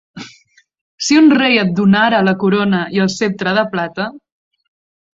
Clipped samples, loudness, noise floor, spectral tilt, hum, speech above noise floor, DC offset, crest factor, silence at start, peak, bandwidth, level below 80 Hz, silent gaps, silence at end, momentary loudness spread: under 0.1%; -14 LUFS; -51 dBFS; -5 dB/octave; none; 38 dB; under 0.1%; 14 dB; 0.15 s; -2 dBFS; 7.8 kHz; -56 dBFS; 0.81-0.98 s; 0.95 s; 13 LU